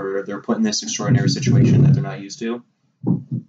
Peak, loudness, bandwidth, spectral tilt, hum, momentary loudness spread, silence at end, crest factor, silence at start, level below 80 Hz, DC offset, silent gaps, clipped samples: -6 dBFS; -19 LUFS; 7.8 kHz; -6 dB/octave; none; 14 LU; 0.05 s; 14 dB; 0 s; -48 dBFS; under 0.1%; none; under 0.1%